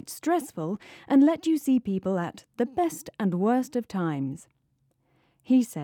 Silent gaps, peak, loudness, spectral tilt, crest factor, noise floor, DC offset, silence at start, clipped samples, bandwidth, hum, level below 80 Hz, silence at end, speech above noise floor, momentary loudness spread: none; -10 dBFS; -26 LUFS; -6.5 dB/octave; 16 dB; -71 dBFS; under 0.1%; 0.05 s; under 0.1%; 18 kHz; none; -66 dBFS; 0 s; 45 dB; 12 LU